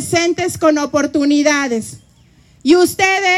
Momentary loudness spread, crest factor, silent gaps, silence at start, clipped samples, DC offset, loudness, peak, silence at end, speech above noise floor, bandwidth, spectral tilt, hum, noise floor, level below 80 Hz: 9 LU; 14 dB; none; 0 s; under 0.1%; under 0.1%; -14 LUFS; 0 dBFS; 0 s; 35 dB; 15 kHz; -3.5 dB/octave; none; -49 dBFS; -54 dBFS